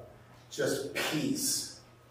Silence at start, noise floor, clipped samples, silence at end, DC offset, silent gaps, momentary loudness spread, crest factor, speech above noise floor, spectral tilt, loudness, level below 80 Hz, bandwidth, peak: 0 s; -54 dBFS; under 0.1%; 0.2 s; under 0.1%; none; 13 LU; 16 dB; 22 dB; -2.5 dB/octave; -32 LUFS; -68 dBFS; 16 kHz; -18 dBFS